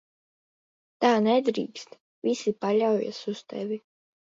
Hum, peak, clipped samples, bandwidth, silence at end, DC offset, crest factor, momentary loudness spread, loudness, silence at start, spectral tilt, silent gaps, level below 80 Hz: none; -8 dBFS; under 0.1%; 7.8 kHz; 0.55 s; under 0.1%; 20 dB; 13 LU; -26 LUFS; 1 s; -5.5 dB/octave; 2.01-2.22 s; -78 dBFS